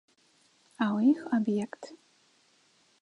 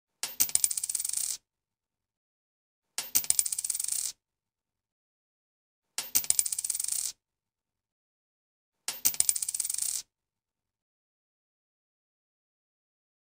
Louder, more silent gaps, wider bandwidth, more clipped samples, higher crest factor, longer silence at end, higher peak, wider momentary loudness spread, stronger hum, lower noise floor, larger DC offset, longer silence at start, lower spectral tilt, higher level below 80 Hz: about the same, -29 LUFS vs -28 LUFS; second, none vs 2.17-2.82 s, 4.92-5.82 s, 7.92-8.72 s; second, 10.5 kHz vs 16 kHz; neither; second, 18 dB vs 34 dB; second, 1.05 s vs 3.2 s; second, -14 dBFS vs 0 dBFS; first, 19 LU vs 13 LU; neither; second, -66 dBFS vs under -90 dBFS; neither; first, 0.8 s vs 0.25 s; first, -7 dB/octave vs 2.5 dB/octave; second, -82 dBFS vs -70 dBFS